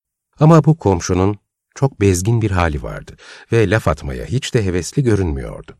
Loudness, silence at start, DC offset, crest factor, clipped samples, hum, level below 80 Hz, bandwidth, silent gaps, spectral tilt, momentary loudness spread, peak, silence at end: -16 LUFS; 0.4 s; under 0.1%; 16 dB; under 0.1%; none; -34 dBFS; 13.5 kHz; none; -6.5 dB/octave; 13 LU; 0 dBFS; 0.1 s